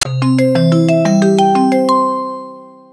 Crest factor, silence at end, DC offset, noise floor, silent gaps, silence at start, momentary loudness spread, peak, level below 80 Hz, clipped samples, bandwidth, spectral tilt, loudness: 12 dB; 0.25 s; under 0.1%; -34 dBFS; none; 0 s; 12 LU; 0 dBFS; -56 dBFS; under 0.1%; 11 kHz; -6.5 dB/octave; -12 LUFS